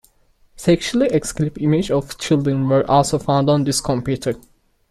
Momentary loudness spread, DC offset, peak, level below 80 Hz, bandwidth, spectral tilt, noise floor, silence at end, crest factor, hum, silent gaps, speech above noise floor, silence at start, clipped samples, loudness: 7 LU; under 0.1%; -2 dBFS; -44 dBFS; 14 kHz; -5.5 dB/octave; -56 dBFS; 0.55 s; 16 dB; none; none; 38 dB; 0.6 s; under 0.1%; -18 LUFS